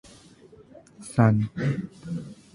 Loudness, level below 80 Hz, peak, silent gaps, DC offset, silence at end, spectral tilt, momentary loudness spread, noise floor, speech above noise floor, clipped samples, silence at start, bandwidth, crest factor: -26 LUFS; -56 dBFS; -6 dBFS; none; under 0.1%; 0.2 s; -8 dB/octave; 15 LU; -52 dBFS; 28 dB; under 0.1%; 1 s; 11 kHz; 22 dB